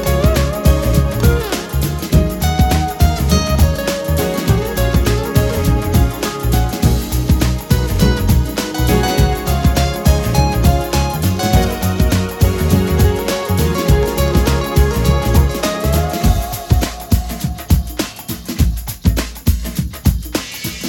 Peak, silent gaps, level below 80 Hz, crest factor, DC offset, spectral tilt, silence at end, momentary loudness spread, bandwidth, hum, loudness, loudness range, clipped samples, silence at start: 0 dBFS; none; -18 dBFS; 14 dB; under 0.1%; -5.5 dB/octave; 0 s; 5 LU; 19.5 kHz; none; -16 LUFS; 3 LU; under 0.1%; 0 s